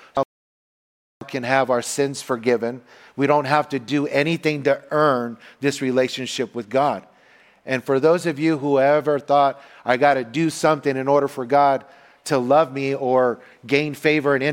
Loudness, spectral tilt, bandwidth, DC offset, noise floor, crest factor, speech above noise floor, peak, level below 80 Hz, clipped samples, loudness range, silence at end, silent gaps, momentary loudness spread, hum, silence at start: -20 LUFS; -5 dB/octave; 17 kHz; under 0.1%; -53 dBFS; 18 dB; 33 dB; -2 dBFS; -66 dBFS; under 0.1%; 3 LU; 0 s; 0.25-1.20 s; 9 LU; none; 0.15 s